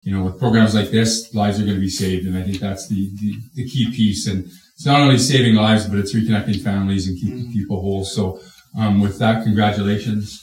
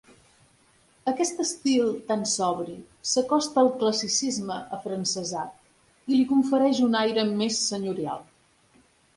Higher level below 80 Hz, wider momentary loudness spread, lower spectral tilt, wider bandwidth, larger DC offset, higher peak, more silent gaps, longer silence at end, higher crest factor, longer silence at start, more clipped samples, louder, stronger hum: first, -48 dBFS vs -68 dBFS; about the same, 12 LU vs 12 LU; first, -5.5 dB/octave vs -3.5 dB/octave; first, 16 kHz vs 11.5 kHz; neither; first, 0 dBFS vs -10 dBFS; neither; second, 0.05 s vs 0.95 s; about the same, 16 dB vs 16 dB; second, 0.05 s vs 1.05 s; neither; first, -18 LUFS vs -25 LUFS; neither